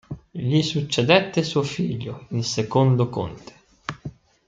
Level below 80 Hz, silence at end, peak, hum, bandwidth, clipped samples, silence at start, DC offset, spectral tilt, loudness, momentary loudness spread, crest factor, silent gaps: -54 dBFS; 0.4 s; -2 dBFS; none; 9 kHz; under 0.1%; 0.1 s; under 0.1%; -5.5 dB/octave; -22 LUFS; 18 LU; 20 dB; none